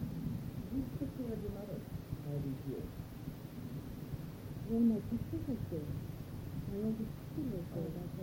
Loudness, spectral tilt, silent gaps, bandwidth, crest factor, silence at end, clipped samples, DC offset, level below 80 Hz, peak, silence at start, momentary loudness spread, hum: -41 LUFS; -8.5 dB/octave; none; 16.5 kHz; 18 dB; 0 s; under 0.1%; under 0.1%; -54 dBFS; -22 dBFS; 0 s; 8 LU; none